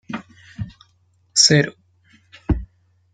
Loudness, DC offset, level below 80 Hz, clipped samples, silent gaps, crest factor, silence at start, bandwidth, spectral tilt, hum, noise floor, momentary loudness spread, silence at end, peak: -17 LUFS; under 0.1%; -36 dBFS; under 0.1%; none; 22 dB; 0.1 s; 10.5 kHz; -3 dB/octave; none; -61 dBFS; 22 LU; 0.5 s; -2 dBFS